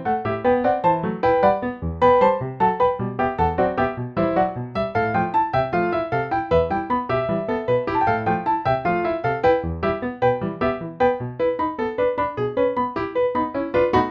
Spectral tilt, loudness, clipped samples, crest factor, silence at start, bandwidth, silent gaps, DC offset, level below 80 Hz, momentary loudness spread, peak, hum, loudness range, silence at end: -8.5 dB/octave; -21 LUFS; under 0.1%; 16 dB; 0 s; 6.2 kHz; none; under 0.1%; -44 dBFS; 5 LU; -4 dBFS; none; 3 LU; 0 s